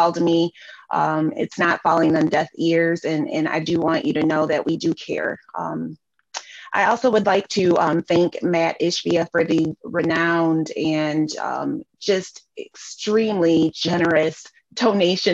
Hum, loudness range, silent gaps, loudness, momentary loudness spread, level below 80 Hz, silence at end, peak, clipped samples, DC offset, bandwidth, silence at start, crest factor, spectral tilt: none; 3 LU; none; -20 LUFS; 11 LU; -60 dBFS; 0 s; -4 dBFS; under 0.1%; under 0.1%; 8 kHz; 0 s; 16 dB; -5.5 dB/octave